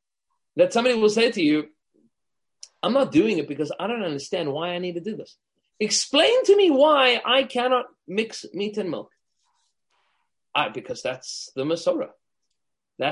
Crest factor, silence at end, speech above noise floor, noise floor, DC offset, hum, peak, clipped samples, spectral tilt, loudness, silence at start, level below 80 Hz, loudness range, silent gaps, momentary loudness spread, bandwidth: 20 dB; 0 s; 64 dB; -86 dBFS; under 0.1%; none; -4 dBFS; under 0.1%; -3.5 dB/octave; -22 LUFS; 0.55 s; -70 dBFS; 10 LU; none; 14 LU; 11.5 kHz